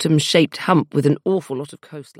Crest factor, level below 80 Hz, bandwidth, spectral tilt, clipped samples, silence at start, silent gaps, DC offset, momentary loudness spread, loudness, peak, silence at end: 18 dB; -68 dBFS; 15 kHz; -5.5 dB/octave; under 0.1%; 0 s; none; under 0.1%; 15 LU; -18 LUFS; 0 dBFS; 0.15 s